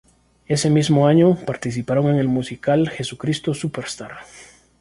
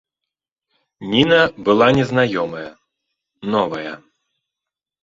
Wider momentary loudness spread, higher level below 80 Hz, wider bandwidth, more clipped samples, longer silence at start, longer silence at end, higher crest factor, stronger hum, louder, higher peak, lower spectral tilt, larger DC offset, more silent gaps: second, 14 LU vs 19 LU; about the same, -54 dBFS vs -54 dBFS; first, 11.5 kHz vs 7.6 kHz; neither; second, 0.5 s vs 1 s; second, 0.4 s vs 1.05 s; about the same, 16 dB vs 18 dB; neither; about the same, -19 LUFS vs -17 LUFS; about the same, -2 dBFS vs -2 dBFS; about the same, -6 dB/octave vs -6 dB/octave; neither; neither